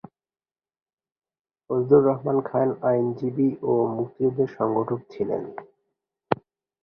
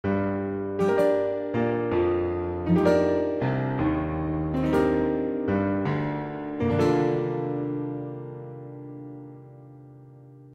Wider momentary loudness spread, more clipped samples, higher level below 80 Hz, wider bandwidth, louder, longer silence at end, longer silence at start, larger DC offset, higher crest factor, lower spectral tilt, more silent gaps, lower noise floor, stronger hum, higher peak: second, 11 LU vs 17 LU; neither; second, -64 dBFS vs -48 dBFS; second, 5.6 kHz vs 10 kHz; about the same, -24 LUFS vs -26 LUFS; first, 0.5 s vs 0 s; first, 1.7 s vs 0.05 s; neither; first, 24 dB vs 18 dB; first, -11 dB/octave vs -8.5 dB/octave; neither; first, under -90 dBFS vs -48 dBFS; neither; first, -2 dBFS vs -8 dBFS